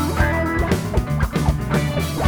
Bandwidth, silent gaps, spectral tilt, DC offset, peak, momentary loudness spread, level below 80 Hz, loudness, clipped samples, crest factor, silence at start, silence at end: over 20 kHz; none; -6 dB/octave; under 0.1%; -4 dBFS; 3 LU; -26 dBFS; -21 LUFS; under 0.1%; 16 dB; 0 s; 0 s